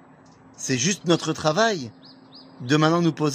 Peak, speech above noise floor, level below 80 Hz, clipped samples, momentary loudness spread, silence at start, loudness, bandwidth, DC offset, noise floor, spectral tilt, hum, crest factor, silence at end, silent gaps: -4 dBFS; 29 dB; -64 dBFS; under 0.1%; 13 LU; 0.6 s; -22 LUFS; 15.5 kHz; under 0.1%; -50 dBFS; -4.5 dB/octave; none; 20 dB; 0 s; none